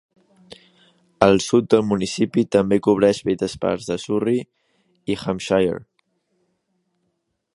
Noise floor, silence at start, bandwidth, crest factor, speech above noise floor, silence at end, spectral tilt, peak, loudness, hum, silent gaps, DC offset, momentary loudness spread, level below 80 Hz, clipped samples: -73 dBFS; 1.2 s; 11.5 kHz; 22 dB; 54 dB; 1.7 s; -5.5 dB/octave; 0 dBFS; -20 LUFS; none; none; under 0.1%; 9 LU; -52 dBFS; under 0.1%